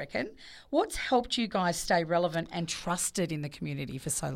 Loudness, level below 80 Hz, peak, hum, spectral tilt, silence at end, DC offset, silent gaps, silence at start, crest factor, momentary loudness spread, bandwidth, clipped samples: -31 LUFS; -54 dBFS; -14 dBFS; none; -4 dB/octave; 0 s; under 0.1%; none; 0 s; 18 dB; 9 LU; 16.5 kHz; under 0.1%